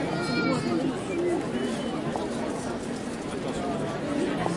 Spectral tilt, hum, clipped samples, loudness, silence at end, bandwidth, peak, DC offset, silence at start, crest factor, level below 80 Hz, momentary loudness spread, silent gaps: -5.5 dB/octave; none; under 0.1%; -29 LUFS; 0 s; 11.5 kHz; -10 dBFS; under 0.1%; 0 s; 18 dB; -52 dBFS; 6 LU; none